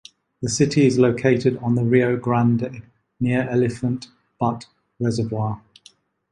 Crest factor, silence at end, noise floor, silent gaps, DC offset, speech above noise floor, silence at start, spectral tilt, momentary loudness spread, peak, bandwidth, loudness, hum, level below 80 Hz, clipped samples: 18 dB; 0.75 s; -54 dBFS; none; under 0.1%; 34 dB; 0.4 s; -6.5 dB/octave; 13 LU; -4 dBFS; 11 kHz; -21 LUFS; none; -54 dBFS; under 0.1%